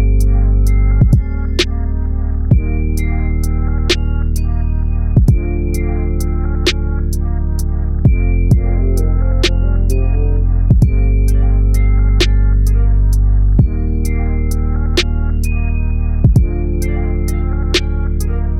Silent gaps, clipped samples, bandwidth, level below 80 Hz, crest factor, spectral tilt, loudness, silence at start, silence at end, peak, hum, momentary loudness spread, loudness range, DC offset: none; under 0.1%; 13 kHz; -14 dBFS; 10 dB; -6 dB/octave; -16 LUFS; 0 s; 0 s; -2 dBFS; none; 6 LU; 3 LU; under 0.1%